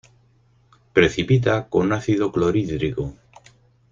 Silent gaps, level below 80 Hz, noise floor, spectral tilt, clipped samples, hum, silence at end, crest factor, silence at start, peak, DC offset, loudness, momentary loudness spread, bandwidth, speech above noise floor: none; -46 dBFS; -58 dBFS; -7 dB/octave; under 0.1%; none; 0.8 s; 20 dB; 0.95 s; -2 dBFS; under 0.1%; -21 LUFS; 7 LU; 7.6 kHz; 38 dB